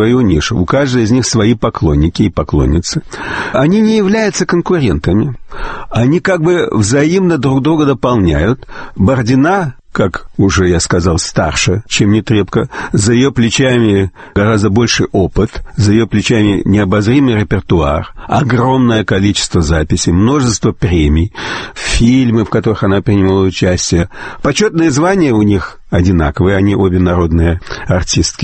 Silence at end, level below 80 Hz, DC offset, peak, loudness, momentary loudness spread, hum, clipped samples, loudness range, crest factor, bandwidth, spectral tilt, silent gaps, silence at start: 0 s; -26 dBFS; under 0.1%; 0 dBFS; -12 LUFS; 6 LU; none; under 0.1%; 1 LU; 10 dB; 8.8 kHz; -5.5 dB/octave; none; 0 s